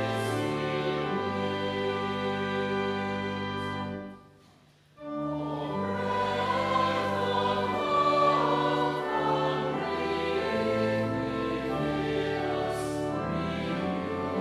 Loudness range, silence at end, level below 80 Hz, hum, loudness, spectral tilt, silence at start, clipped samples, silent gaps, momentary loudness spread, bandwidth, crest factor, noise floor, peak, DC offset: 7 LU; 0 s; -54 dBFS; none; -29 LUFS; -6 dB/octave; 0 s; under 0.1%; none; 7 LU; 15 kHz; 16 dB; -59 dBFS; -12 dBFS; under 0.1%